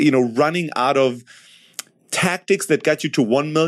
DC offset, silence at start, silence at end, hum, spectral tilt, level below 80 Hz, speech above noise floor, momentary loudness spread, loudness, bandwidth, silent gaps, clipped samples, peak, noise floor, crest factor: under 0.1%; 0 s; 0 s; none; -4.5 dB/octave; -70 dBFS; 21 dB; 18 LU; -19 LUFS; 14.5 kHz; none; under 0.1%; -4 dBFS; -39 dBFS; 16 dB